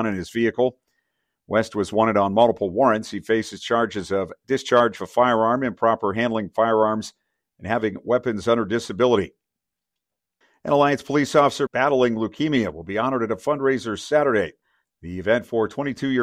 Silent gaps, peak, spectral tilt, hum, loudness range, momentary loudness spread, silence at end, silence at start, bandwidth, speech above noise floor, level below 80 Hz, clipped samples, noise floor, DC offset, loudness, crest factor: none; -4 dBFS; -5.5 dB/octave; none; 3 LU; 8 LU; 0 s; 0 s; 14.5 kHz; 64 dB; -58 dBFS; under 0.1%; -85 dBFS; under 0.1%; -22 LUFS; 18 dB